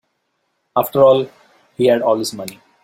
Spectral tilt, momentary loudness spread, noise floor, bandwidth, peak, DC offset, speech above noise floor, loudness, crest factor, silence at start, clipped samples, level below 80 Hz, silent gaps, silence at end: -5.5 dB/octave; 18 LU; -69 dBFS; 16.5 kHz; -2 dBFS; under 0.1%; 54 dB; -16 LUFS; 16 dB; 0.75 s; under 0.1%; -60 dBFS; none; 0.3 s